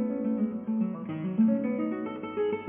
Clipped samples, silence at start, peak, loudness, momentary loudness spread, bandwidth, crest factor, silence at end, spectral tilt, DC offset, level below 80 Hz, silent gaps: under 0.1%; 0 s; -16 dBFS; -30 LUFS; 8 LU; 3.3 kHz; 14 dB; 0 s; -8 dB/octave; under 0.1%; -70 dBFS; none